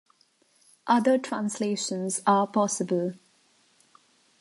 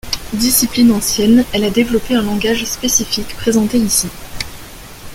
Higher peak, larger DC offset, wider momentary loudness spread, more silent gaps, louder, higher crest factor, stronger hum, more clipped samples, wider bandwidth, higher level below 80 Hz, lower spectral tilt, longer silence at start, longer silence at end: second, -10 dBFS vs 0 dBFS; neither; second, 8 LU vs 15 LU; neither; second, -26 LUFS vs -14 LUFS; about the same, 18 dB vs 14 dB; neither; neither; second, 11.5 kHz vs 17 kHz; second, -80 dBFS vs -34 dBFS; first, -4.5 dB/octave vs -3 dB/octave; first, 0.85 s vs 0.05 s; first, 1.25 s vs 0 s